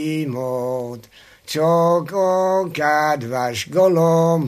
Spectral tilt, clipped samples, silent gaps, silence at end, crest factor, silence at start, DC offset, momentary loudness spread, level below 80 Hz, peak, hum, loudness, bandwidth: -6 dB/octave; under 0.1%; none; 0 s; 14 dB; 0 s; under 0.1%; 10 LU; -64 dBFS; -4 dBFS; none; -19 LUFS; 15 kHz